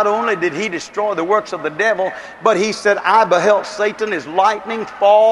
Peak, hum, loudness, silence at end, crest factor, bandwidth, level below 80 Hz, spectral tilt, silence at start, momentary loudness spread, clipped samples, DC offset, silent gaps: 0 dBFS; none; -16 LUFS; 0 s; 16 dB; 11.5 kHz; -60 dBFS; -4 dB/octave; 0 s; 9 LU; under 0.1%; under 0.1%; none